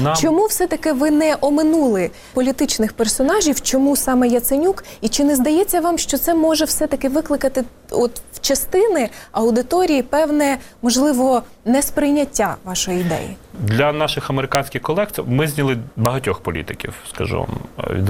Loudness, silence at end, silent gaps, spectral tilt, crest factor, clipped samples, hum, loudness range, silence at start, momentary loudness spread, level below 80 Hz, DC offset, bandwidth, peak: -18 LUFS; 0 s; none; -4.5 dB/octave; 18 dB; under 0.1%; none; 3 LU; 0 s; 8 LU; -40 dBFS; under 0.1%; 17 kHz; 0 dBFS